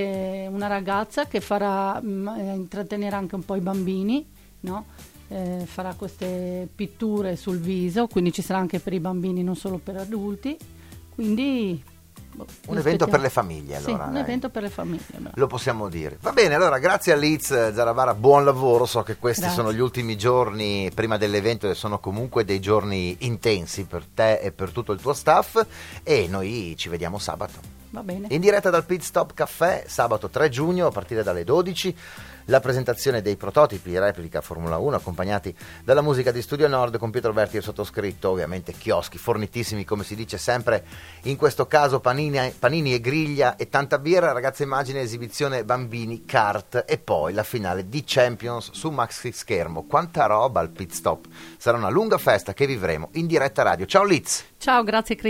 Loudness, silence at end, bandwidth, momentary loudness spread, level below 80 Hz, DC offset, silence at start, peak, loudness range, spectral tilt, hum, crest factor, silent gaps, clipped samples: -23 LUFS; 0 s; 16.5 kHz; 12 LU; -52 dBFS; under 0.1%; 0 s; 0 dBFS; 7 LU; -5 dB/octave; none; 22 dB; none; under 0.1%